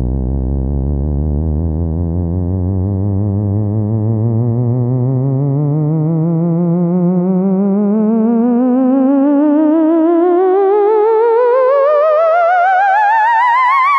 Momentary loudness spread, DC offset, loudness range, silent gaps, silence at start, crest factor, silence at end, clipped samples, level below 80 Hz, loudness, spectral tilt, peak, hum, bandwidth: 7 LU; under 0.1%; 6 LU; none; 0 s; 10 dB; 0 s; under 0.1%; -26 dBFS; -13 LUFS; -10.5 dB/octave; -2 dBFS; none; 6 kHz